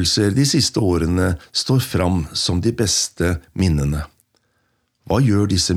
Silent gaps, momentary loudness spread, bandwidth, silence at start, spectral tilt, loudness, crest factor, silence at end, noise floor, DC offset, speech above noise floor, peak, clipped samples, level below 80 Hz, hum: none; 6 LU; 16 kHz; 0 s; -4.5 dB/octave; -18 LUFS; 14 dB; 0 s; -67 dBFS; under 0.1%; 49 dB; -4 dBFS; under 0.1%; -38 dBFS; none